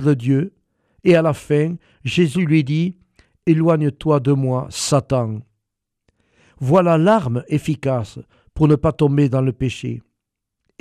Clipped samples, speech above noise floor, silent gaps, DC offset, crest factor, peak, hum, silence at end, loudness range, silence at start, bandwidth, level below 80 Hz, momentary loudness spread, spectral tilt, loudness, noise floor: under 0.1%; 63 dB; none; under 0.1%; 16 dB; -4 dBFS; none; 0.8 s; 2 LU; 0 s; 13 kHz; -46 dBFS; 12 LU; -7 dB/octave; -18 LUFS; -80 dBFS